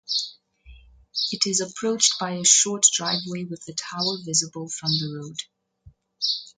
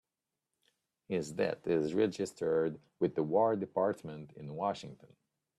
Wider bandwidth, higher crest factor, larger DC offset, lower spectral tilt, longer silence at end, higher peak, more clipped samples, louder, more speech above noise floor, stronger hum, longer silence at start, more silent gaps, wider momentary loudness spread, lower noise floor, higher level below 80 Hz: second, 10 kHz vs 12.5 kHz; about the same, 24 dB vs 20 dB; neither; second, -1.5 dB/octave vs -6.5 dB/octave; second, 0.1 s vs 0.65 s; first, -2 dBFS vs -16 dBFS; neither; first, -22 LUFS vs -34 LUFS; second, 30 dB vs 56 dB; neither; second, 0.1 s vs 1.1 s; neither; about the same, 16 LU vs 14 LU; second, -54 dBFS vs -90 dBFS; first, -60 dBFS vs -74 dBFS